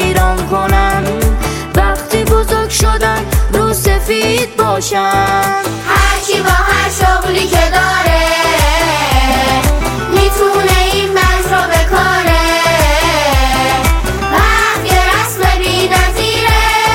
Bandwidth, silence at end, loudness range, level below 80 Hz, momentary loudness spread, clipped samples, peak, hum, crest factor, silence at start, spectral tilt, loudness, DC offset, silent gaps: 17 kHz; 0 s; 2 LU; -18 dBFS; 3 LU; under 0.1%; 0 dBFS; none; 10 dB; 0 s; -4 dB/octave; -11 LUFS; under 0.1%; none